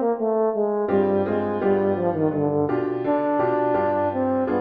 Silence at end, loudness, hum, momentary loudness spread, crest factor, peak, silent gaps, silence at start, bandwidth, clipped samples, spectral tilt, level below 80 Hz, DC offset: 0 s; -22 LUFS; none; 2 LU; 14 dB; -8 dBFS; none; 0 s; 4.9 kHz; under 0.1%; -11 dB/octave; -60 dBFS; under 0.1%